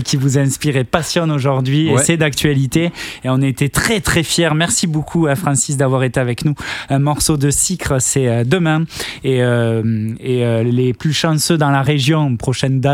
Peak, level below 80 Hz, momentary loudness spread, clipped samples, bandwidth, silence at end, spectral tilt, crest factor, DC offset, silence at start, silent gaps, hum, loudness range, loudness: 0 dBFS; -40 dBFS; 5 LU; under 0.1%; 16.5 kHz; 0 s; -4.5 dB/octave; 14 dB; under 0.1%; 0 s; none; none; 1 LU; -15 LUFS